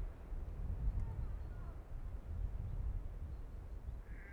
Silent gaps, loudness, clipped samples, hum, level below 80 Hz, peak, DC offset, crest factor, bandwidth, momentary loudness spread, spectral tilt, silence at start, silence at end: none; -47 LUFS; under 0.1%; none; -44 dBFS; -26 dBFS; under 0.1%; 16 dB; 4.3 kHz; 8 LU; -8.5 dB/octave; 0 s; 0 s